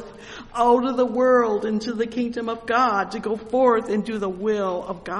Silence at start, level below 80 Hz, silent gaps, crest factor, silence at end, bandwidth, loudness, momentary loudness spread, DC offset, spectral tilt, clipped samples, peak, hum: 0 s; -54 dBFS; none; 16 dB; 0 s; 11 kHz; -22 LUFS; 10 LU; under 0.1%; -6 dB/octave; under 0.1%; -6 dBFS; none